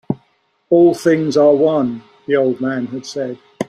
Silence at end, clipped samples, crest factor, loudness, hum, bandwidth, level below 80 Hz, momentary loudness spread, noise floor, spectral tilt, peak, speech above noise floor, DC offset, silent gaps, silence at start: 0.05 s; under 0.1%; 14 dB; -15 LUFS; none; 12 kHz; -60 dBFS; 14 LU; -61 dBFS; -6.5 dB/octave; -2 dBFS; 46 dB; under 0.1%; none; 0.1 s